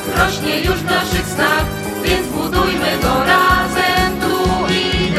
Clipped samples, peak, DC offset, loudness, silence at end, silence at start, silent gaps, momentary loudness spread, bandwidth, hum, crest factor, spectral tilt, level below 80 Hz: under 0.1%; 0 dBFS; under 0.1%; -15 LUFS; 0 s; 0 s; none; 5 LU; 15.5 kHz; none; 16 dB; -4 dB/octave; -28 dBFS